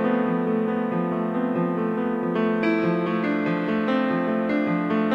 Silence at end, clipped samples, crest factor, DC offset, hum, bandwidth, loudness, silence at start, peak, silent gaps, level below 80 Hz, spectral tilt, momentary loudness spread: 0 s; under 0.1%; 12 dB; under 0.1%; none; 5.8 kHz; -24 LUFS; 0 s; -10 dBFS; none; -68 dBFS; -9 dB/octave; 3 LU